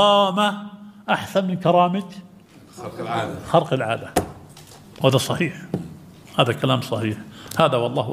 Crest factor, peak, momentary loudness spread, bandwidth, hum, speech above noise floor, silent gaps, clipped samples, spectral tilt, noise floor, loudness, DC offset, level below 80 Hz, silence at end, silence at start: 22 dB; 0 dBFS; 18 LU; 16 kHz; none; 24 dB; none; under 0.1%; -5.5 dB/octave; -44 dBFS; -21 LUFS; under 0.1%; -54 dBFS; 0 s; 0 s